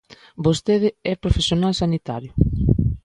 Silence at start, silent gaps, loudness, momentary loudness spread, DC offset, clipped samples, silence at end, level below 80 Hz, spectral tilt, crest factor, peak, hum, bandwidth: 0.4 s; none; -21 LUFS; 6 LU; under 0.1%; under 0.1%; 0.05 s; -30 dBFS; -6.5 dB/octave; 20 dB; 0 dBFS; none; 11 kHz